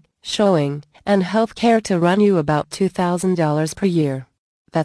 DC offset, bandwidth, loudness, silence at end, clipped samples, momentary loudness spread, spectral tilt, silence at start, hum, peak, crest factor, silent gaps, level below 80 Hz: under 0.1%; 11 kHz; -19 LUFS; 0 s; under 0.1%; 9 LU; -6 dB/octave; 0.25 s; none; -4 dBFS; 14 dB; 4.38-4.65 s; -54 dBFS